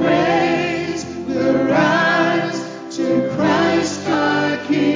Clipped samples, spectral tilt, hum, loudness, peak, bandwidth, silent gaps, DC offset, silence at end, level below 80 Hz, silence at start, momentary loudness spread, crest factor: under 0.1%; -5 dB/octave; none; -17 LUFS; -4 dBFS; 7.6 kHz; none; under 0.1%; 0 s; -52 dBFS; 0 s; 9 LU; 14 dB